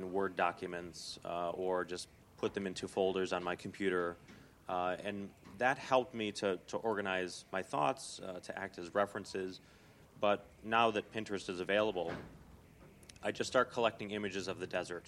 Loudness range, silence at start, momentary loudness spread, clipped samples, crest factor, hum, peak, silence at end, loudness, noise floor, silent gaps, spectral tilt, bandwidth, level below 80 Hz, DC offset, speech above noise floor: 2 LU; 0 s; 11 LU; under 0.1%; 22 dB; none; -16 dBFS; 0 s; -37 LUFS; -59 dBFS; none; -4.5 dB/octave; 16 kHz; -70 dBFS; under 0.1%; 22 dB